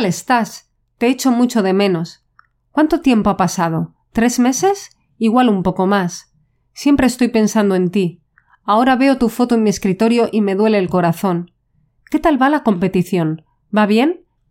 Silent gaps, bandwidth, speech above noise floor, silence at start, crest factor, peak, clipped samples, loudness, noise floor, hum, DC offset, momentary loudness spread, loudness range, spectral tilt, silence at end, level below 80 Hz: none; 16.5 kHz; 46 dB; 0 s; 16 dB; 0 dBFS; under 0.1%; -16 LUFS; -60 dBFS; none; under 0.1%; 9 LU; 2 LU; -5.5 dB/octave; 0.35 s; -44 dBFS